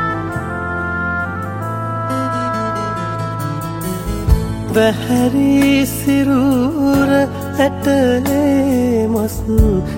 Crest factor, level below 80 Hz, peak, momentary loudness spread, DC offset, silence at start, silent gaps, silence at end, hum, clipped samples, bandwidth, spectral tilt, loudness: 14 dB; -26 dBFS; 0 dBFS; 9 LU; under 0.1%; 0 s; none; 0 s; none; under 0.1%; 16.5 kHz; -6.5 dB/octave; -16 LUFS